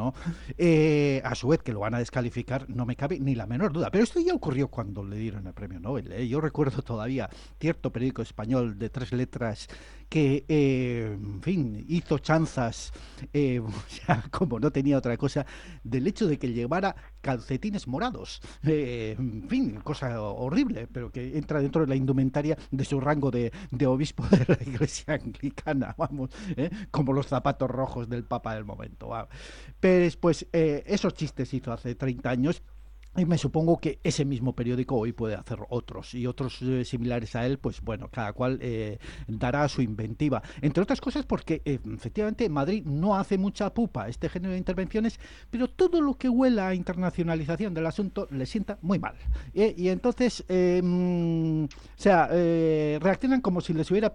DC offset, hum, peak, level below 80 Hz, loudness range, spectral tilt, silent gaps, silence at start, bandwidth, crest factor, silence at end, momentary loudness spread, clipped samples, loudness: under 0.1%; none; -8 dBFS; -46 dBFS; 4 LU; -7 dB/octave; none; 0 s; 11 kHz; 20 dB; 0 s; 11 LU; under 0.1%; -28 LUFS